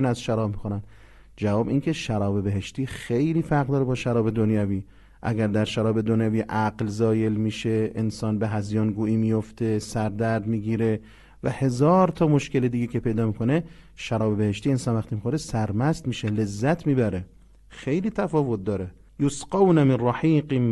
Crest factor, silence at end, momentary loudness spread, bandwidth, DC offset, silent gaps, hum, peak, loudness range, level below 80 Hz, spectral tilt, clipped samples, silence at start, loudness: 18 dB; 0 s; 8 LU; 12 kHz; under 0.1%; none; none; -6 dBFS; 3 LU; -48 dBFS; -7.5 dB/octave; under 0.1%; 0 s; -24 LUFS